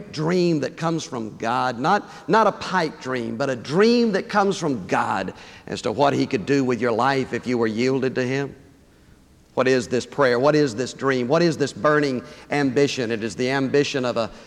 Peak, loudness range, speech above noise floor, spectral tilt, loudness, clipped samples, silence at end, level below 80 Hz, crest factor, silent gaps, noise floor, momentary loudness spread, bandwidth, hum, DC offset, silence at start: -6 dBFS; 2 LU; 31 dB; -5.5 dB/octave; -22 LUFS; under 0.1%; 0 s; -58 dBFS; 16 dB; none; -52 dBFS; 8 LU; 12 kHz; none; under 0.1%; 0 s